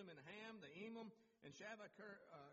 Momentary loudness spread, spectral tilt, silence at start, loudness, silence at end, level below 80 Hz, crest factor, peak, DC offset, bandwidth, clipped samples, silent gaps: 6 LU; -3.5 dB/octave; 0 s; -58 LUFS; 0 s; under -90 dBFS; 16 dB; -44 dBFS; under 0.1%; 7.4 kHz; under 0.1%; none